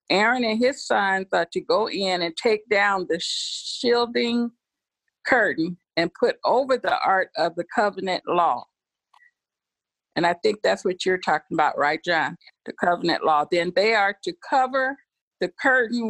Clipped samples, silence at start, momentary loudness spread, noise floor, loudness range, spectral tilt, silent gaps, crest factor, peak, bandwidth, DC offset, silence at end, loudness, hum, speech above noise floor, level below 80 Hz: under 0.1%; 0.1 s; 8 LU; -88 dBFS; 3 LU; -4 dB/octave; 15.22-15.31 s; 18 dB; -4 dBFS; 11.5 kHz; under 0.1%; 0 s; -23 LUFS; none; 66 dB; -66 dBFS